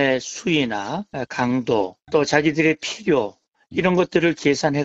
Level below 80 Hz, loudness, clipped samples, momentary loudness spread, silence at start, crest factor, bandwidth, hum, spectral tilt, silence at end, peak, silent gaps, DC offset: -54 dBFS; -21 LUFS; under 0.1%; 10 LU; 0 s; 20 dB; 8 kHz; none; -5 dB/octave; 0 s; -2 dBFS; none; under 0.1%